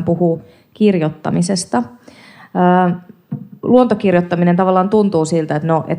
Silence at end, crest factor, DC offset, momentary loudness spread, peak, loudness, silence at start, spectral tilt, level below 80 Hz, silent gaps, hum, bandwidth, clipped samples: 0 s; 14 dB; under 0.1%; 12 LU; -2 dBFS; -15 LUFS; 0 s; -7 dB/octave; -58 dBFS; none; none; 11 kHz; under 0.1%